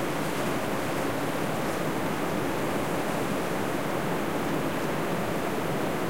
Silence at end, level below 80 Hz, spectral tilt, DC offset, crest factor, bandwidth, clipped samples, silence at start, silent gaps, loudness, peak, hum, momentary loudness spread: 0 s; -54 dBFS; -5 dB/octave; 1%; 12 dB; 16 kHz; under 0.1%; 0 s; none; -29 LUFS; -16 dBFS; none; 1 LU